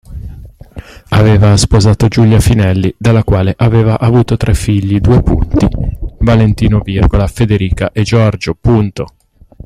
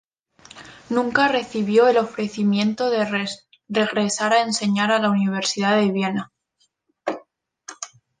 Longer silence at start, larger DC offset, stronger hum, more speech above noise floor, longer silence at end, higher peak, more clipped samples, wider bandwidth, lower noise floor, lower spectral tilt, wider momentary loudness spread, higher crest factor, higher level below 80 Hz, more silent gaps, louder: second, 0.1 s vs 0.55 s; neither; neither; second, 22 dB vs 48 dB; first, 0.6 s vs 0.35 s; first, 0 dBFS vs -4 dBFS; neither; first, 13 kHz vs 9.8 kHz; second, -31 dBFS vs -68 dBFS; first, -7 dB/octave vs -4.5 dB/octave; second, 7 LU vs 18 LU; second, 10 dB vs 18 dB; first, -20 dBFS vs -66 dBFS; neither; first, -11 LUFS vs -21 LUFS